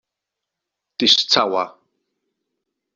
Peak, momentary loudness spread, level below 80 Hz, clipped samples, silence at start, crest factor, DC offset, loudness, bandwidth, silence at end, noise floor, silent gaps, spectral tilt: 0 dBFS; 17 LU; -72 dBFS; under 0.1%; 1 s; 22 dB; under 0.1%; -16 LUFS; 7.8 kHz; 1.25 s; -83 dBFS; none; -2 dB/octave